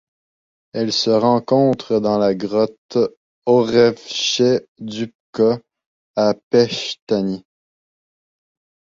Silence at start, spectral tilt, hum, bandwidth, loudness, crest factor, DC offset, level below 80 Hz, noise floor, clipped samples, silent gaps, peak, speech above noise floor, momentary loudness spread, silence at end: 0.75 s; -5 dB/octave; none; 7.6 kHz; -18 LUFS; 18 dB; under 0.1%; -60 dBFS; under -90 dBFS; under 0.1%; 2.78-2.89 s, 3.17-3.42 s, 4.68-4.75 s, 5.15-5.33 s, 5.86-6.14 s, 6.43-6.51 s, 7.02-7.07 s; -2 dBFS; over 73 dB; 12 LU; 1.6 s